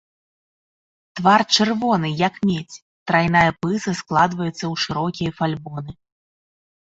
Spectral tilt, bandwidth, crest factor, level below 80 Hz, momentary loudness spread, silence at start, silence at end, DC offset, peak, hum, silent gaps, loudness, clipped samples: -5 dB/octave; 8 kHz; 20 dB; -54 dBFS; 17 LU; 1.15 s; 1 s; under 0.1%; -2 dBFS; none; 2.82-3.06 s; -20 LUFS; under 0.1%